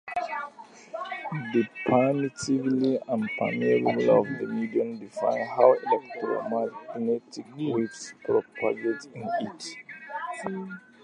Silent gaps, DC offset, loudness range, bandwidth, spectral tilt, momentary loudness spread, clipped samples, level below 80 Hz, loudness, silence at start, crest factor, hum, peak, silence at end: none; under 0.1%; 6 LU; 10.5 kHz; -6 dB/octave; 14 LU; under 0.1%; -70 dBFS; -27 LUFS; 0.05 s; 22 dB; none; -4 dBFS; 0.25 s